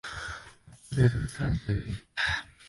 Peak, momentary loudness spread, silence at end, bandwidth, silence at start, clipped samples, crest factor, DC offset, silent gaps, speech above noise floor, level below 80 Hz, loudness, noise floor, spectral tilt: -12 dBFS; 13 LU; 0.05 s; 11.5 kHz; 0.05 s; under 0.1%; 18 dB; under 0.1%; none; 24 dB; -44 dBFS; -30 LUFS; -52 dBFS; -6 dB/octave